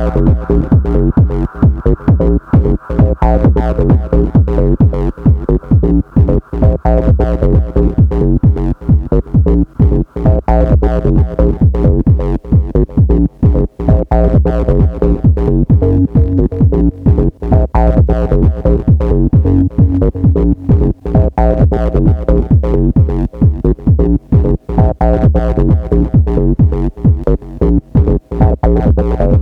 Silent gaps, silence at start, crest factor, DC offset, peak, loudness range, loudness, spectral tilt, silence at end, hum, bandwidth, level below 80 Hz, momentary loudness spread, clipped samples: none; 0 s; 10 dB; under 0.1%; 0 dBFS; 1 LU; -12 LUFS; -11.5 dB/octave; 0 s; none; 3.7 kHz; -14 dBFS; 3 LU; under 0.1%